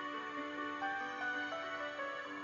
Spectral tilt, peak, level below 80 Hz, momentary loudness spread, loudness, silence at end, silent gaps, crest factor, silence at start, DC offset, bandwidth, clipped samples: -3 dB/octave; -28 dBFS; -80 dBFS; 3 LU; -41 LUFS; 0 s; none; 12 dB; 0 s; under 0.1%; 7.6 kHz; under 0.1%